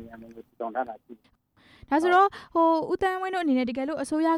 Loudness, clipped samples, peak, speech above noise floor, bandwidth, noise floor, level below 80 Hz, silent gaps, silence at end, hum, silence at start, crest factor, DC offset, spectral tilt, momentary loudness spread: -25 LUFS; under 0.1%; -10 dBFS; 29 dB; 12.5 kHz; -55 dBFS; -60 dBFS; none; 0 s; none; 0 s; 16 dB; under 0.1%; -4.5 dB/octave; 16 LU